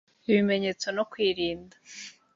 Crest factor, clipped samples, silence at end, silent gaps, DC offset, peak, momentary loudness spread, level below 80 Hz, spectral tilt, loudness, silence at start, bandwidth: 18 dB; under 0.1%; 0.25 s; none; under 0.1%; -12 dBFS; 19 LU; -64 dBFS; -5 dB/octave; -27 LUFS; 0.3 s; 7.8 kHz